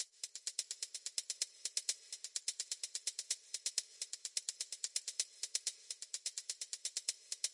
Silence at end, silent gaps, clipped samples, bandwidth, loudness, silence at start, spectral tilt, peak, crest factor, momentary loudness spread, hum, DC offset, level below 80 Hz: 0 s; none; under 0.1%; 11.5 kHz; -41 LUFS; 0 s; 6 dB/octave; -18 dBFS; 26 dB; 5 LU; none; under 0.1%; under -90 dBFS